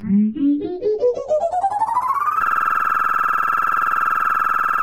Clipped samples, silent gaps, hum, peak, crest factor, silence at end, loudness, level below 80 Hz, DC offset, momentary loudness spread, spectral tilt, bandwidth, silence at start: under 0.1%; none; none; -8 dBFS; 12 dB; 0 s; -18 LUFS; -54 dBFS; under 0.1%; 3 LU; -7 dB/octave; 17 kHz; 0 s